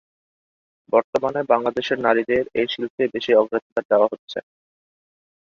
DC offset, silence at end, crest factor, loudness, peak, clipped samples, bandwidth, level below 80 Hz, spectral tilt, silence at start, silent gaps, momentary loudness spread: under 0.1%; 1 s; 20 dB; -21 LUFS; -2 dBFS; under 0.1%; 7.2 kHz; -62 dBFS; -5.5 dB/octave; 0.9 s; 1.04-1.13 s, 2.90-2.98 s, 3.62-3.76 s, 3.85-3.89 s, 4.19-4.27 s; 7 LU